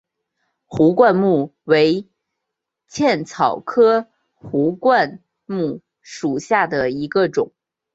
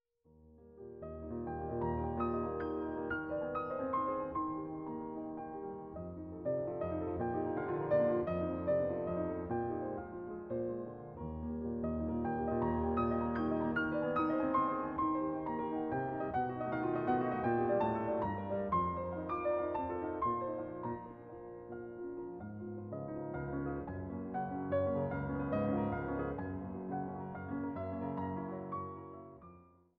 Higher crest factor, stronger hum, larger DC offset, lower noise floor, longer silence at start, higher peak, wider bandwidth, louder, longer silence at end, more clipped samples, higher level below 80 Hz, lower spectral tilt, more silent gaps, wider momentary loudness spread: about the same, 16 dB vs 16 dB; neither; neither; first, -81 dBFS vs -65 dBFS; first, 0.7 s vs 0.35 s; first, -2 dBFS vs -20 dBFS; first, 8 kHz vs 5.2 kHz; first, -18 LUFS vs -38 LUFS; first, 0.5 s vs 0.35 s; neither; about the same, -60 dBFS vs -56 dBFS; second, -6 dB/octave vs -7.5 dB/octave; neither; about the same, 12 LU vs 11 LU